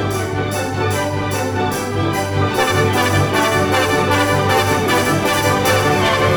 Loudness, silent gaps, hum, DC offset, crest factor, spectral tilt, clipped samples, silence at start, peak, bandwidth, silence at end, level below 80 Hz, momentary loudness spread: -16 LUFS; none; none; under 0.1%; 12 dB; -4.5 dB/octave; under 0.1%; 0 s; -4 dBFS; over 20 kHz; 0 s; -42 dBFS; 5 LU